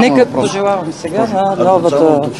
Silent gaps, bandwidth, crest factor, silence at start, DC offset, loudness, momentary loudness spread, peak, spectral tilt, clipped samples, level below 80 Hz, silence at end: none; 12 kHz; 12 dB; 0 s; 0.2%; -13 LUFS; 7 LU; 0 dBFS; -6 dB/octave; 0.1%; -52 dBFS; 0 s